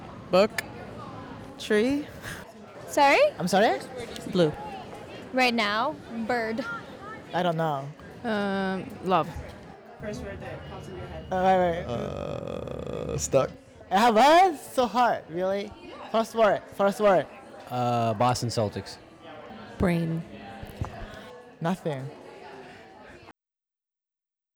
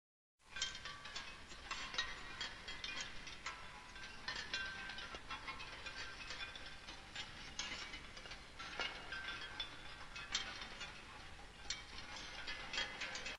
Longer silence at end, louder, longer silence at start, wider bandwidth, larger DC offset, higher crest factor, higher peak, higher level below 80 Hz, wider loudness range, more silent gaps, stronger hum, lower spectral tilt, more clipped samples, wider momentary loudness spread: first, 1.25 s vs 0 s; first, -26 LUFS vs -47 LUFS; second, 0 s vs 0.4 s; first, over 20 kHz vs 12 kHz; neither; second, 18 dB vs 24 dB; first, -10 dBFS vs -24 dBFS; first, -54 dBFS vs -62 dBFS; first, 9 LU vs 2 LU; neither; neither; first, -5 dB/octave vs -1 dB/octave; neither; first, 20 LU vs 10 LU